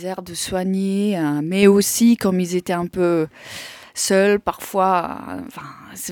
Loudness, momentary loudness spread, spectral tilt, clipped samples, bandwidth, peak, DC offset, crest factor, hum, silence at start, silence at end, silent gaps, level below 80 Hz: -19 LUFS; 18 LU; -5 dB/octave; under 0.1%; 19 kHz; -2 dBFS; under 0.1%; 18 dB; none; 0 s; 0 s; none; -54 dBFS